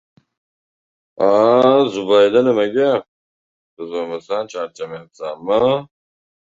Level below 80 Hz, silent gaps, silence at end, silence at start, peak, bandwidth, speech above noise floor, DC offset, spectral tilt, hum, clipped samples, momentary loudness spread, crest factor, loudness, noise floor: -60 dBFS; 3.08-3.77 s; 0.65 s; 1.2 s; 0 dBFS; 7.6 kHz; over 73 dB; under 0.1%; -6 dB/octave; none; under 0.1%; 17 LU; 18 dB; -16 LUFS; under -90 dBFS